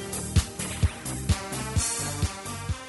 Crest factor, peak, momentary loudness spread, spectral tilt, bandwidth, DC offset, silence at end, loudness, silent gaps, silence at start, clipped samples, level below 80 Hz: 18 dB; -10 dBFS; 6 LU; -4 dB/octave; 12 kHz; under 0.1%; 0 s; -28 LUFS; none; 0 s; under 0.1%; -36 dBFS